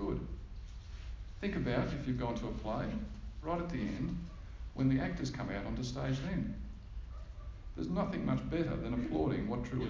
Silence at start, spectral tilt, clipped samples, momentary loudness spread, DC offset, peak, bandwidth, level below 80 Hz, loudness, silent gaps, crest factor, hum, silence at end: 0 s; -7.5 dB/octave; under 0.1%; 14 LU; under 0.1%; -20 dBFS; 7.6 kHz; -46 dBFS; -37 LUFS; none; 18 dB; none; 0 s